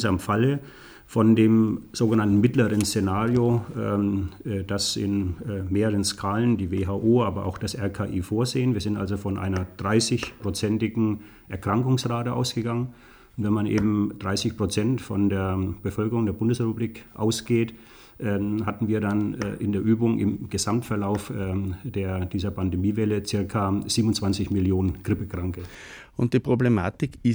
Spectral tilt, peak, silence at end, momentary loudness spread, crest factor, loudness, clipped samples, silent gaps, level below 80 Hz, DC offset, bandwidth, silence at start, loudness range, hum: -6 dB/octave; -8 dBFS; 0 s; 8 LU; 16 dB; -25 LUFS; under 0.1%; none; -48 dBFS; under 0.1%; over 20 kHz; 0 s; 5 LU; none